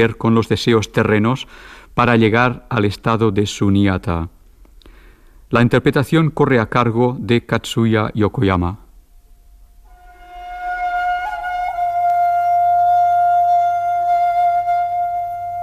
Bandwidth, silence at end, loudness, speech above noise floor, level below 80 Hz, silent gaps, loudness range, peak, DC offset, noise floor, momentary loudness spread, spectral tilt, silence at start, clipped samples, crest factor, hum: 14 kHz; 0 s; -17 LUFS; 30 dB; -42 dBFS; none; 7 LU; -2 dBFS; under 0.1%; -46 dBFS; 9 LU; -6.5 dB/octave; 0 s; under 0.1%; 16 dB; none